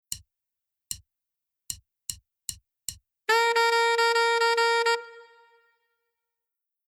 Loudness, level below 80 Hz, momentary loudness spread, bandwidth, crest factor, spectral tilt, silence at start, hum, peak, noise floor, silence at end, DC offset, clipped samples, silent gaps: -23 LUFS; -64 dBFS; 17 LU; 18 kHz; 18 dB; 1 dB/octave; 0.1 s; none; -12 dBFS; -87 dBFS; 1.65 s; under 0.1%; under 0.1%; none